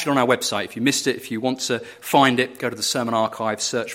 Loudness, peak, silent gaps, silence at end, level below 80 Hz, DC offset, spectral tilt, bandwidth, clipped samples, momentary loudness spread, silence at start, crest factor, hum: -21 LUFS; -2 dBFS; none; 0 s; -66 dBFS; under 0.1%; -3 dB/octave; 16.5 kHz; under 0.1%; 8 LU; 0 s; 20 dB; none